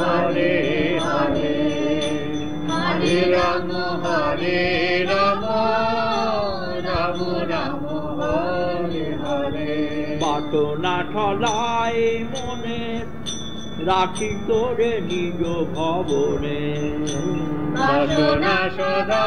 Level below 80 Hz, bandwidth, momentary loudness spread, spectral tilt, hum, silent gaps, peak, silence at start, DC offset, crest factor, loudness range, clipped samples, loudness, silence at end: -44 dBFS; 10.5 kHz; 7 LU; -5.5 dB/octave; none; none; -6 dBFS; 0 s; 3%; 14 dB; 4 LU; under 0.1%; -22 LUFS; 0 s